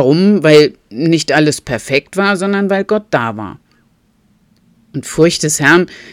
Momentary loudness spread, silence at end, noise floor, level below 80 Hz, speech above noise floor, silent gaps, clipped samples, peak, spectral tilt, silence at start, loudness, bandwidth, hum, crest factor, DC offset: 13 LU; 0 s; -55 dBFS; -48 dBFS; 43 dB; none; 0.3%; 0 dBFS; -4.5 dB/octave; 0 s; -12 LUFS; 16 kHz; none; 14 dB; under 0.1%